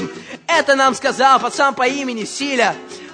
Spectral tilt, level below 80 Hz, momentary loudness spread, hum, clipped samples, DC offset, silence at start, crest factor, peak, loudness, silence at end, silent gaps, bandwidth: -2.5 dB/octave; -64 dBFS; 12 LU; none; under 0.1%; under 0.1%; 0 s; 16 dB; 0 dBFS; -16 LUFS; 0 s; none; 9.6 kHz